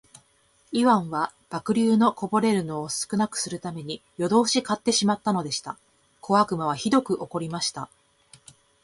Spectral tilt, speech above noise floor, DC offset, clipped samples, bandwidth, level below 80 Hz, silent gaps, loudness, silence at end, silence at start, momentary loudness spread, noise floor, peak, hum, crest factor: -4.5 dB/octave; 39 dB; under 0.1%; under 0.1%; 11.5 kHz; -64 dBFS; none; -24 LUFS; 0.95 s; 0.7 s; 12 LU; -63 dBFS; -8 dBFS; none; 18 dB